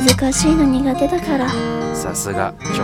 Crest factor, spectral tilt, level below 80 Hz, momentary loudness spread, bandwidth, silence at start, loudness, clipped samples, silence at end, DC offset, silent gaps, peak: 16 dB; -4.5 dB/octave; -34 dBFS; 7 LU; 17.5 kHz; 0 s; -17 LUFS; under 0.1%; 0 s; under 0.1%; none; 0 dBFS